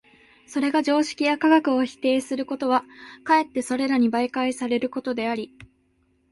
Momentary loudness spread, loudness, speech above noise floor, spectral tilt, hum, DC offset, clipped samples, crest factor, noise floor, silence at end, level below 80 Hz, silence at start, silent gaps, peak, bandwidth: 10 LU; -23 LUFS; 43 dB; -4 dB/octave; none; under 0.1%; under 0.1%; 18 dB; -65 dBFS; 0.7 s; -64 dBFS; 0.5 s; none; -6 dBFS; 11.5 kHz